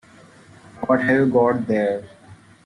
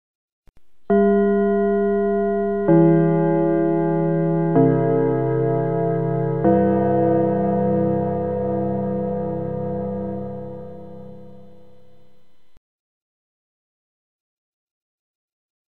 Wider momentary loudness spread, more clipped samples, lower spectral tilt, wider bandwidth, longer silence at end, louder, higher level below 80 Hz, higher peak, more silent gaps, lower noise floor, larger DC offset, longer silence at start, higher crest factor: about the same, 11 LU vs 11 LU; neither; second, -8 dB/octave vs -12.5 dB/octave; first, 10.5 kHz vs 3.5 kHz; about the same, 0.3 s vs 0.25 s; about the same, -20 LUFS vs -20 LUFS; second, -60 dBFS vs -50 dBFS; about the same, -6 dBFS vs -4 dBFS; second, none vs 0.15-0.43 s, 12.57-15.49 s; second, -48 dBFS vs -62 dBFS; second, under 0.1% vs 0.9%; first, 0.75 s vs 0.15 s; about the same, 16 dB vs 16 dB